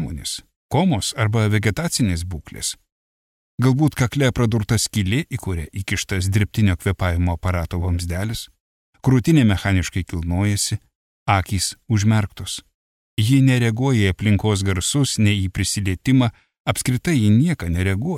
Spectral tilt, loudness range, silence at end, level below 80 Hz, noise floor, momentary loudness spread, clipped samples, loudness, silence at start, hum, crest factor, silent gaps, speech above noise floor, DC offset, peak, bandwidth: -5.5 dB/octave; 3 LU; 0 s; -38 dBFS; under -90 dBFS; 11 LU; under 0.1%; -20 LUFS; 0 s; none; 16 dB; 0.56-0.69 s, 2.92-3.58 s, 8.60-8.93 s, 10.95-11.26 s, 12.74-13.17 s, 16.60-16.65 s; over 71 dB; under 0.1%; -4 dBFS; 15.5 kHz